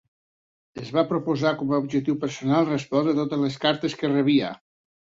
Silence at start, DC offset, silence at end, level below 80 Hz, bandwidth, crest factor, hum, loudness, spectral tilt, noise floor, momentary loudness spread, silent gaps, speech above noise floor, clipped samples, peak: 0.75 s; under 0.1%; 0.5 s; -64 dBFS; 7.8 kHz; 18 dB; none; -24 LUFS; -6.5 dB/octave; under -90 dBFS; 6 LU; none; over 67 dB; under 0.1%; -6 dBFS